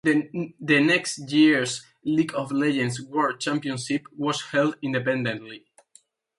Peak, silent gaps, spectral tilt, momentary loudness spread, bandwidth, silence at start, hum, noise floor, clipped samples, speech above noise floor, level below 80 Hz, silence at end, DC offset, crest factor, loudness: -6 dBFS; none; -4.5 dB/octave; 11 LU; 11.5 kHz; 0.05 s; none; -59 dBFS; under 0.1%; 35 dB; -68 dBFS; 0.8 s; under 0.1%; 20 dB; -24 LUFS